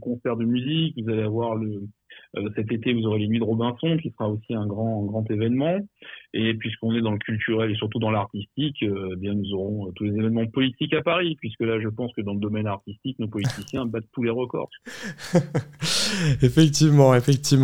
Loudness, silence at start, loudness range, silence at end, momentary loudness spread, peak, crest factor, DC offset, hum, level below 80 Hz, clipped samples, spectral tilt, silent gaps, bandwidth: -24 LUFS; 0 s; 5 LU; 0 s; 11 LU; -4 dBFS; 20 dB; under 0.1%; none; -52 dBFS; under 0.1%; -6 dB/octave; none; 16.5 kHz